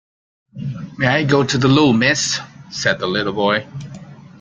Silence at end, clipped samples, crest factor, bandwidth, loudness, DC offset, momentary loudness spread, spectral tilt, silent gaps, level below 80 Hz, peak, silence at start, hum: 0.2 s; under 0.1%; 16 dB; 9.4 kHz; -16 LUFS; under 0.1%; 18 LU; -4.5 dB/octave; none; -52 dBFS; -2 dBFS; 0.55 s; none